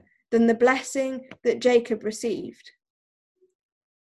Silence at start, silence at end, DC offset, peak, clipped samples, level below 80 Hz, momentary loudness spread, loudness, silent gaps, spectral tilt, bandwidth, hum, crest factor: 0.3 s; 1.35 s; under 0.1%; -8 dBFS; under 0.1%; -66 dBFS; 11 LU; -24 LUFS; none; -4 dB/octave; 12.5 kHz; none; 18 dB